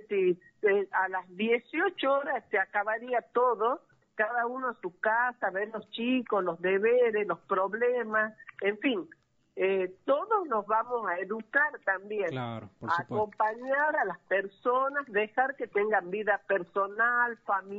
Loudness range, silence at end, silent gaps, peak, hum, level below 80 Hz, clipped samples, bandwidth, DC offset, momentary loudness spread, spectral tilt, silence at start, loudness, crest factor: 2 LU; 0 s; none; -12 dBFS; none; -78 dBFS; under 0.1%; 7 kHz; under 0.1%; 6 LU; -2.5 dB/octave; 0.1 s; -29 LUFS; 16 dB